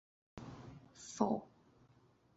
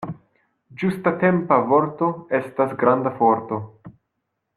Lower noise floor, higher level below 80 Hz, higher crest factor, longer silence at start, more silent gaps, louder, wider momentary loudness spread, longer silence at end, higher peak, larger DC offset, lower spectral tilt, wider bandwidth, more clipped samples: second, -70 dBFS vs -77 dBFS; second, -70 dBFS vs -64 dBFS; first, 28 dB vs 18 dB; first, 0.35 s vs 0 s; neither; second, -41 LUFS vs -21 LUFS; first, 21 LU vs 13 LU; first, 0.85 s vs 0.65 s; second, -18 dBFS vs -4 dBFS; neither; second, -6.5 dB/octave vs -9 dB/octave; second, 8 kHz vs 12.5 kHz; neither